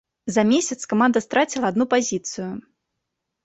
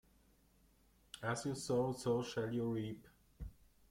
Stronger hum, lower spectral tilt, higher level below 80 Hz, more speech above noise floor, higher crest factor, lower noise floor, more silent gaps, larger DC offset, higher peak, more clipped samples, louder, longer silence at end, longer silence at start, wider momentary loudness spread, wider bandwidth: neither; second, -4 dB/octave vs -5.5 dB/octave; about the same, -62 dBFS vs -62 dBFS; first, 59 dB vs 32 dB; about the same, 16 dB vs 18 dB; first, -80 dBFS vs -71 dBFS; neither; neither; first, -6 dBFS vs -24 dBFS; neither; first, -21 LUFS vs -40 LUFS; first, 0.85 s vs 0.4 s; second, 0.25 s vs 1.15 s; second, 12 LU vs 18 LU; second, 8.2 kHz vs 16.5 kHz